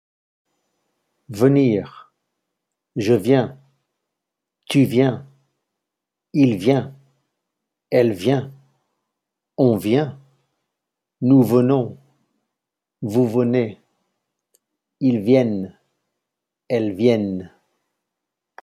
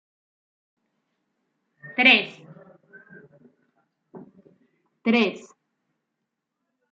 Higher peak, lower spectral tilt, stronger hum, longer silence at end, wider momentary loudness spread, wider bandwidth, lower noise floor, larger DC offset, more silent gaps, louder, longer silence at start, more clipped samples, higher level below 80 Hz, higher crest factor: about the same, -2 dBFS vs -4 dBFS; first, -8 dB/octave vs -4.5 dB/octave; neither; second, 1.15 s vs 1.55 s; second, 15 LU vs 19 LU; first, 14.5 kHz vs 7.6 kHz; about the same, -84 dBFS vs -81 dBFS; neither; neither; about the same, -19 LUFS vs -20 LUFS; second, 1.3 s vs 1.85 s; neither; first, -68 dBFS vs -80 dBFS; about the same, 20 dB vs 24 dB